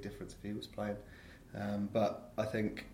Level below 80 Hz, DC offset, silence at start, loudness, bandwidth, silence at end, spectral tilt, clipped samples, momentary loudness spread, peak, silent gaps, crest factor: -60 dBFS; under 0.1%; 0 s; -39 LUFS; 16.5 kHz; 0 s; -6.5 dB/octave; under 0.1%; 14 LU; -20 dBFS; none; 18 dB